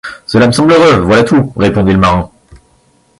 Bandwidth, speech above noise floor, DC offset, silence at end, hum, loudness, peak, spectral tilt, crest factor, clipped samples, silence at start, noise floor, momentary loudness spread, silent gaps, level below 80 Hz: 11.5 kHz; 43 dB; under 0.1%; 0.65 s; none; -9 LUFS; 0 dBFS; -6 dB/octave; 10 dB; under 0.1%; 0.05 s; -51 dBFS; 7 LU; none; -30 dBFS